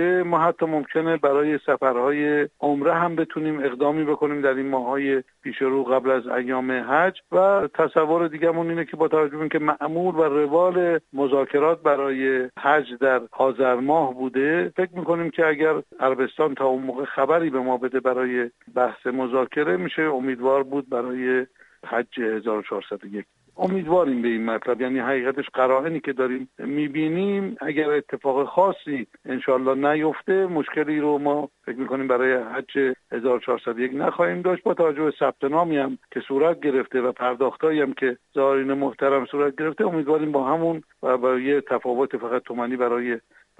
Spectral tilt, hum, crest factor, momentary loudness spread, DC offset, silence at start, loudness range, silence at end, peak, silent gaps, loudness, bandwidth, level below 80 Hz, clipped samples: -8 dB/octave; none; 18 dB; 6 LU; under 0.1%; 0 s; 3 LU; 0.4 s; -4 dBFS; none; -23 LUFS; 8.2 kHz; -68 dBFS; under 0.1%